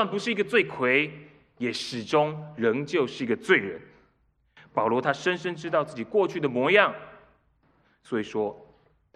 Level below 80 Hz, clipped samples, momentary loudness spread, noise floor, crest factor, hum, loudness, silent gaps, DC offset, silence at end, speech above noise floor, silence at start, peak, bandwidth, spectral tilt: -70 dBFS; under 0.1%; 11 LU; -68 dBFS; 24 dB; none; -26 LUFS; none; under 0.1%; 0.5 s; 42 dB; 0 s; -2 dBFS; 11.5 kHz; -5 dB/octave